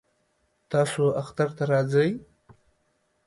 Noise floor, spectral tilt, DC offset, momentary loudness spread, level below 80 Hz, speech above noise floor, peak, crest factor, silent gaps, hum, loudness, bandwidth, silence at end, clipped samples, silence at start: -71 dBFS; -6.5 dB/octave; under 0.1%; 6 LU; -64 dBFS; 47 dB; -10 dBFS; 16 dB; none; none; -25 LUFS; 11.5 kHz; 1.05 s; under 0.1%; 0.7 s